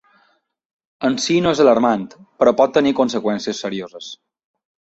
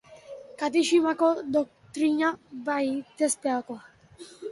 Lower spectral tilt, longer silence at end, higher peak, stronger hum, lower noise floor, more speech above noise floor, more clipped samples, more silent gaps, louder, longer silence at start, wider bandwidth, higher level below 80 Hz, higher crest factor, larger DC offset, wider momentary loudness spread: first, -5 dB/octave vs -3 dB/octave; first, 0.8 s vs 0 s; first, -2 dBFS vs -10 dBFS; neither; first, -63 dBFS vs -49 dBFS; first, 45 dB vs 24 dB; neither; neither; first, -17 LUFS vs -26 LUFS; first, 1 s vs 0.1 s; second, 8.2 kHz vs 11.5 kHz; first, -58 dBFS vs -72 dBFS; about the same, 18 dB vs 16 dB; neither; about the same, 17 LU vs 19 LU